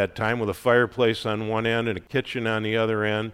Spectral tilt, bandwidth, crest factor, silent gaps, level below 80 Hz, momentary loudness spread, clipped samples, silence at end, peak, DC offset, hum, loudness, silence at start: -6 dB/octave; 16 kHz; 18 dB; none; -56 dBFS; 6 LU; under 0.1%; 0 s; -6 dBFS; under 0.1%; none; -24 LUFS; 0 s